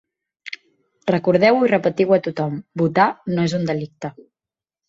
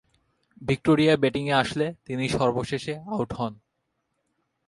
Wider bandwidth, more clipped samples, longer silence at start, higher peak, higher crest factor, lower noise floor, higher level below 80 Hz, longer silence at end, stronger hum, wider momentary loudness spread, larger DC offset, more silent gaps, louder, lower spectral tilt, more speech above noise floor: second, 7.8 kHz vs 11.5 kHz; neither; second, 0.45 s vs 0.6 s; first, -2 dBFS vs -6 dBFS; about the same, 18 dB vs 20 dB; first, under -90 dBFS vs -77 dBFS; second, -60 dBFS vs -54 dBFS; second, 0.75 s vs 1.15 s; neither; first, 19 LU vs 11 LU; neither; neither; first, -19 LUFS vs -25 LUFS; about the same, -7 dB/octave vs -6 dB/octave; first, over 72 dB vs 53 dB